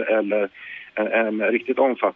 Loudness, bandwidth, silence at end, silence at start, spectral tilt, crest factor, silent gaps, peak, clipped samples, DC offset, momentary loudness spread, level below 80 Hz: -22 LUFS; 3.9 kHz; 0.05 s; 0 s; -8.5 dB/octave; 16 dB; none; -6 dBFS; under 0.1%; under 0.1%; 10 LU; -74 dBFS